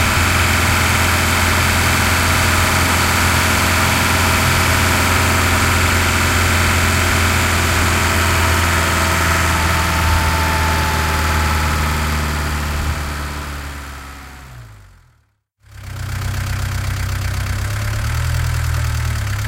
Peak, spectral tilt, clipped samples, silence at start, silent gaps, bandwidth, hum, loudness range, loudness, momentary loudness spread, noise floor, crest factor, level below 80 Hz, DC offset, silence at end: -2 dBFS; -3.5 dB/octave; under 0.1%; 0 s; none; 16.5 kHz; none; 12 LU; -15 LUFS; 9 LU; -60 dBFS; 14 dB; -24 dBFS; under 0.1%; 0 s